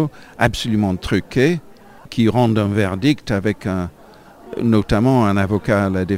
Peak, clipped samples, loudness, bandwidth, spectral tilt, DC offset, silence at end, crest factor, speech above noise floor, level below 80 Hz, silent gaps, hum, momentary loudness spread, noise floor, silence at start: 0 dBFS; under 0.1%; -18 LUFS; 16 kHz; -7 dB/octave; under 0.1%; 0 s; 18 dB; 26 dB; -38 dBFS; none; none; 9 LU; -43 dBFS; 0 s